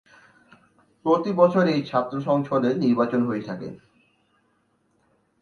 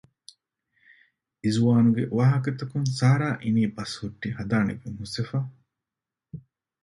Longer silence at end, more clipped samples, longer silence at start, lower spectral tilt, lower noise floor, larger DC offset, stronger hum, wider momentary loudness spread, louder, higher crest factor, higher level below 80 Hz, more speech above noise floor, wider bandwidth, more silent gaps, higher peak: first, 1.65 s vs 0.45 s; neither; second, 1.05 s vs 1.45 s; about the same, -8 dB/octave vs -7 dB/octave; second, -67 dBFS vs -89 dBFS; neither; neither; second, 12 LU vs 15 LU; about the same, -23 LUFS vs -25 LUFS; about the same, 22 dB vs 18 dB; second, -68 dBFS vs -58 dBFS; second, 46 dB vs 65 dB; second, 6.8 kHz vs 11.5 kHz; neither; first, -4 dBFS vs -8 dBFS